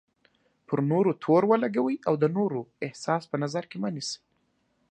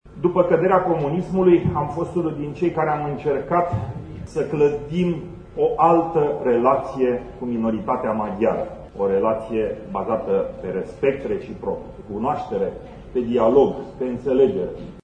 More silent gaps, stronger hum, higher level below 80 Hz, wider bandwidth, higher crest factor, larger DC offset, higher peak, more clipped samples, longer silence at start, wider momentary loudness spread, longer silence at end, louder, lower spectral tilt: neither; neither; second, -76 dBFS vs -46 dBFS; about the same, 9.6 kHz vs 9.2 kHz; about the same, 20 dB vs 18 dB; neither; second, -8 dBFS vs -2 dBFS; neither; first, 0.7 s vs 0.05 s; about the same, 12 LU vs 11 LU; first, 0.75 s vs 0.05 s; second, -27 LUFS vs -21 LUFS; second, -6.5 dB/octave vs -9 dB/octave